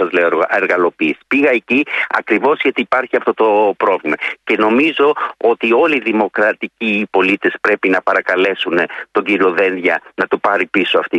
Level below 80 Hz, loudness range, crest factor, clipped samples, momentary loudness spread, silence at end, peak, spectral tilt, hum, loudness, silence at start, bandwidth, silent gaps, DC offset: -62 dBFS; 1 LU; 14 dB; under 0.1%; 4 LU; 0 s; -2 dBFS; -6 dB/octave; none; -14 LUFS; 0 s; 9 kHz; none; under 0.1%